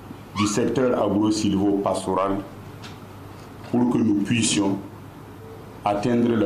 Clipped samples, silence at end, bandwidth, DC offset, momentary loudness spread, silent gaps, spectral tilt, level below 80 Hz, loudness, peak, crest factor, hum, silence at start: under 0.1%; 0 s; 15 kHz; under 0.1%; 20 LU; none; -5 dB/octave; -54 dBFS; -22 LUFS; -8 dBFS; 14 dB; none; 0 s